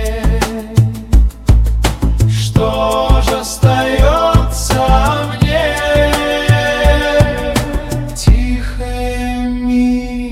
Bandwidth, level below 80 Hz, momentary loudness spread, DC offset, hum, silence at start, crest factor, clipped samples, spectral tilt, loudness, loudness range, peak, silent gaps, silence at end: 15.5 kHz; -16 dBFS; 7 LU; under 0.1%; none; 0 s; 12 dB; under 0.1%; -5.5 dB/octave; -14 LUFS; 2 LU; 0 dBFS; none; 0 s